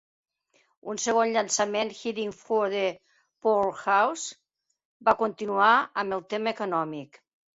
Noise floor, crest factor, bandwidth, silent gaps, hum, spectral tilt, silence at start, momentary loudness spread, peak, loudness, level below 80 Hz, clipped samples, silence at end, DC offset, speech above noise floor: -69 dBFS; 20 dB; 8.2 kHz; 4.85-5.00 s; none; -2.5 dB/octave; 0.85 s; 11 LU; -6 dBFS; -26 LUFS; -70 dBFS; under 0.1%; 0.5 s; under 0.1%; 43 dB